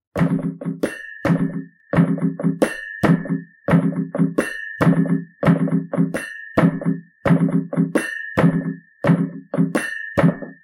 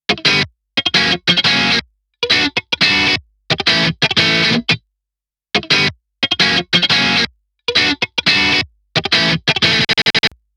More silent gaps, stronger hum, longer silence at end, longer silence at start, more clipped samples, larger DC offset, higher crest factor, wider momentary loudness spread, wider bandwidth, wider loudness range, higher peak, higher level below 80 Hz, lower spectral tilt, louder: neither; neither; second, 0.1 s vs 0.3 s; about the same, 0.15 s vs 0.1 s; neither; neither; about the same, 20 dB vs 16 dB; about the same, 8 LU vs 8 LU; second, 12 kHz vs 16 kHz; about the same, 1 LU vs 1 LU; about the same, 0 dBFS vs 0 dBFS; about the same, -50 dBFS vs -48 dBFS; first, -8 dB/octave vs -3 dB/octave; second, -20 LUFS vs -13 LUFS